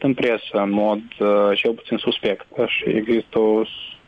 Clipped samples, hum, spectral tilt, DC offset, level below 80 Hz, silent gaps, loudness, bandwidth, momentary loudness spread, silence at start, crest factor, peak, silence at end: under 0.1%; none; -7.5 dB/octave; under 0.1%; -58 dBFS; none; -20 LUFS; 6.2 kHz; 6 LU; 0 s; 12 dB; -8 dBFS; 0.1 s